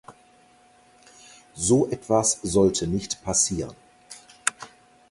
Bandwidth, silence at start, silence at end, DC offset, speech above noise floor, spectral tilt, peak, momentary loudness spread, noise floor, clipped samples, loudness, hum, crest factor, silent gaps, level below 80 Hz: 11.5 kHz; 0.1 s; 0.45 s; under 0.1%; 34 dB; -4 dB/octave; -2 dBFS; 24 LU; -57 dBFS; under 0.1%; -23 LUFS; none; 24 dB; none; -50 dBFS